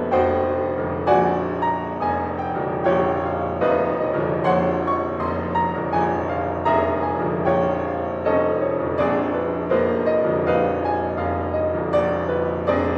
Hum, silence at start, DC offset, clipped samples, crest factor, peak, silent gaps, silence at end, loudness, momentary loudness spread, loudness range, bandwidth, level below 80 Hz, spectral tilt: none; 0 s; under 0.1%; under 0.1%; 16 dB; -6 dBFS; none; 0 s; -22 LUFS; 4 LU; 1 LU; 6.6 kHz; -44 dBFS; -9 dB/octave